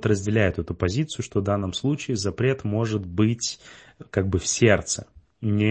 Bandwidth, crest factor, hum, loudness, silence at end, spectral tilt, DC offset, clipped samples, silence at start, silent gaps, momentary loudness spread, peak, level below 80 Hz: 8.8 kHz; 20 dB; none; -24 LUFS; 0 s; -5 dB/octave; under 0.1%; under 0.1%; 0 s; none; 9 LU; -4 dBFS; -48 dBFS